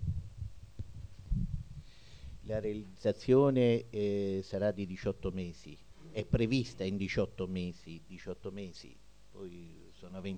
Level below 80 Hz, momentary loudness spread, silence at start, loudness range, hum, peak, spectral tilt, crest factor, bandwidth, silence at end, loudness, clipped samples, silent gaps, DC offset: -48 dBFS; 22 LU; 0 s; 8 LU; none; -16 dBFS; -7.5 dB/octave; 20 dB; 9.4 kHz; 0 s; -34 LUFS; under 0.1%; none; 0.2%